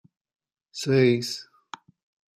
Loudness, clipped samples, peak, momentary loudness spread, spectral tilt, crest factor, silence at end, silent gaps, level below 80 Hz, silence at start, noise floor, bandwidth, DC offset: -23 LUFS; under 0.1%; -8 dBFS; 24 LU; -5.5 dB/octave; 20 dB; 0.95 s; none; -68 dBFS; 0.75 s; -46 dBFS; 14.5 kHz; under 0.1%